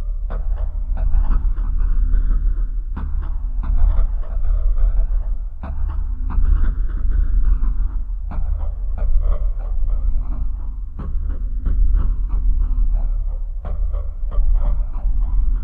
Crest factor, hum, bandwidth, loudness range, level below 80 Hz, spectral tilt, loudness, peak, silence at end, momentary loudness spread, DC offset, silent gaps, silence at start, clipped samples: 12 dB; none; 1.8 kHz; 2 LU; -18 dBFS; -11 dB/octave; -24 LUFS; -4 dBFS; 0 s; 7 LU; 0.4%; none; 0 s; under 0.1%